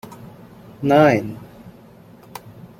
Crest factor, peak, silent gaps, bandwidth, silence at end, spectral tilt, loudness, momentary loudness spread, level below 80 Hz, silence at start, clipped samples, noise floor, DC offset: 20 dB; -2 dBFS; none; 16.5 kHz; 0.3 s; -7 dB/octave; -17 LUFS; 25 LU; -56 dBFS; 0.1 s; under 0.1%; -45 dBFS; under 0.1%